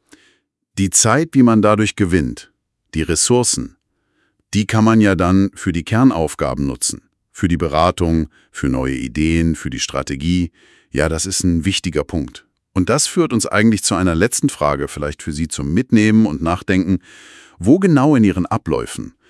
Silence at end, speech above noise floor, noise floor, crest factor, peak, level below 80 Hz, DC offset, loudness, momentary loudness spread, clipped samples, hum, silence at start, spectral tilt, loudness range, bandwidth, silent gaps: 0.2 s; 49 dB; -65 dBFS; 16 dB; 0 dBFS; -38 dBFS; under 0.1%; -16 LUFS; 11 LU; under 0.1%; none; 0.75 s; -5 dB/octave; 4 LU; 12 kHz; none